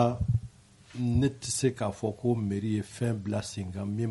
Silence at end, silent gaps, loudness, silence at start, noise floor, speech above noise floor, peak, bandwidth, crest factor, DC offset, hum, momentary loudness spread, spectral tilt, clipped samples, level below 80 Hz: 0 s; none; -31 LUFS; 0 s; -52 dBFS; 23 dB; -10 dBFS; 11.5 kHz; 20 dB; under 0.1%; none; 8 LU; -6 dB/octave; under 0.1%; -48 dBFS